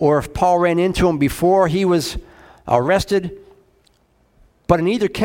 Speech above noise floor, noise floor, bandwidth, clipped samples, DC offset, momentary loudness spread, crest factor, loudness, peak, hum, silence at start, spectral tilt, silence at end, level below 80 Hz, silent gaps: 42 dB; -58 dBFS; 16.5 kHz; under 0.1%; under 0.1%; 13 LU; 18 dB; -17 LUFS; 0 dBFS; none; 0 s; -6 dB/octave; 0 s; -38 dBFS; none